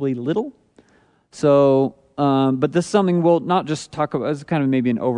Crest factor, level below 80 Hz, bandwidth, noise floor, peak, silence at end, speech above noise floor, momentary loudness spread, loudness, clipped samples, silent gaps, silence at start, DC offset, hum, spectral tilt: 16 dB; -62 dBFS; 10.5 kHz; -58 dBFS; -4 dBFS; 0 s; 39 dB; 9 LU; -19 LUFS; under 0.1%; none; 0 s; under 0.1%; none; -7 dB/octave